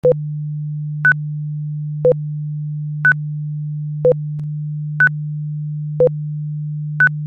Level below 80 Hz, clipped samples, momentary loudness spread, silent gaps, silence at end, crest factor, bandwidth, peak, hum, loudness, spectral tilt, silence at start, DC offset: -54 dBFS; under 0.1%; 9 LU; none; 0 s; 14 dB; 3.6 kHz; -4 dBFS; none; -19 LUFS; -10 dB/octave; 0.05 s; under 0.1%